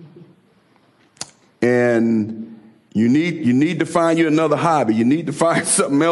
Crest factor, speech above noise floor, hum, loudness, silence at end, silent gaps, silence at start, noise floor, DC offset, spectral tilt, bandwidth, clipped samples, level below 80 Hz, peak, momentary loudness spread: 14 dB; 39 dB; none; -17 LUFS; 0 s; none; 0 s; -56 dBFS; under 0.1%; -5 dB/octave; 12 kHz; under 0.1%; -64 dBFS; -4 dBFS; 18 LU